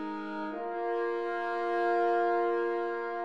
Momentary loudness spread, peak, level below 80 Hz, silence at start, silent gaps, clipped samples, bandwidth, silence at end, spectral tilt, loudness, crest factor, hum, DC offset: 9 LU; -18 dBFS; -74 dBFS; 0 s; none; under 0.1%; 7.2 kHz; 0 s; -6 dB/octave; -31 LUFS; 12 dB; none; 0.2%